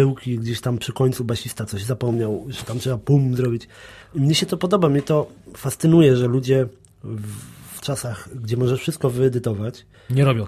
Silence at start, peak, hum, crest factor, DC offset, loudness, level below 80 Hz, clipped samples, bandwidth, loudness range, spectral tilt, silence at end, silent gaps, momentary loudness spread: 0 s; -4 dBFS; none; 16 dB; under 0.1%; -21 LUFS; -50 dBFS; under 0.1%; 15 kHz; 5 LU; -6.5 dB/octave; 0 s; none; 14 LU